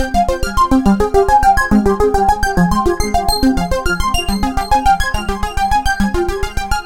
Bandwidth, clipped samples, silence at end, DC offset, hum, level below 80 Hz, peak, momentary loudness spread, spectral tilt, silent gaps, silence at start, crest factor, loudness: 17 kHz; under 0.1%; 0 s; under 0.1%; none; -22 dBFS; 0 dBFS; 7 LU; -5 dB/octave; none; 0 s; 14 dB; -15 LUFS